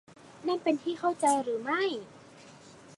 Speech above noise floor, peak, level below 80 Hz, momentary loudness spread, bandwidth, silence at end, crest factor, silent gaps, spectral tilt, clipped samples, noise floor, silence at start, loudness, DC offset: 23 dB; -14 dBFS; -78 dBFS; 11 LU; 11.5 kHz; 0.05 s; 18 dB; none; -3.5 dB/octave; under 0.1%; -53 dBFS; 0.25 s; -30 LUFS; under 0.1%